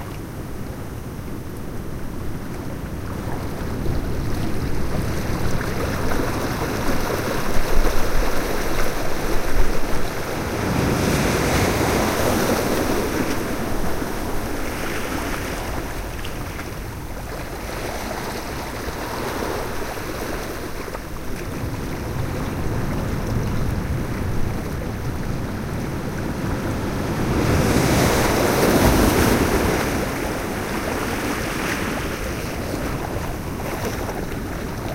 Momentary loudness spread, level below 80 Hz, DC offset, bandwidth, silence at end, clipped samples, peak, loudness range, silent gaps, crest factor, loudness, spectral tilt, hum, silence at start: 12 LU; -28 dBFS; under 0.1%; 16 kHz; 0 s; under 0.1%; -4 dBFS; 10 LU; none; 18 dB; -24 LUFS; -5 dB/octave; none; 0 s